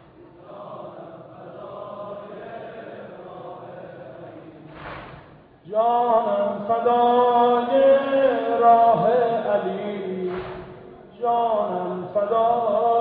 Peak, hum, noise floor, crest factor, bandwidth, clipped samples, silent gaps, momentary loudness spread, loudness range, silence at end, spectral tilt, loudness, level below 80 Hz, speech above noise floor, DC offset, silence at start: -6 dBFS; none; -47 dBFS; 18 dB; 4.7 kHz; under 0.1%; none; 23 LU; 20 LU; 0 s; -9.5 dB/octave; -20 LUFS; -60 dBFS; 28 dB; under 0.1%; 0.2 s